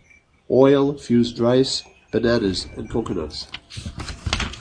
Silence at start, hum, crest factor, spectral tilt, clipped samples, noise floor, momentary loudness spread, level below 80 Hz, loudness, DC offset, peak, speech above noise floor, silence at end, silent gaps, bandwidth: 0.5 s; none; 20 dB; -5.5 dB/octave; under 0.1%; -54 dBFS; 17 LU; -40 dBFS; -20 LUFS; under 0.1%; -2 dBFS; 34 dB; 0 s; none; 10 kHz